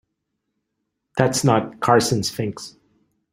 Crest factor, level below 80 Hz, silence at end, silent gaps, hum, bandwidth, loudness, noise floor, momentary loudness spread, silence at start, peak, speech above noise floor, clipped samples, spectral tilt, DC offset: 22 dB; -56 dBFS; 0.65 s; none; none; 16 kHz; -20 LUFS; -77 dBFS; 14 LU; 1.15 s; 0 dBFS; 58 dB; under 0.1%; -4.5 dB/octave; under 0.1%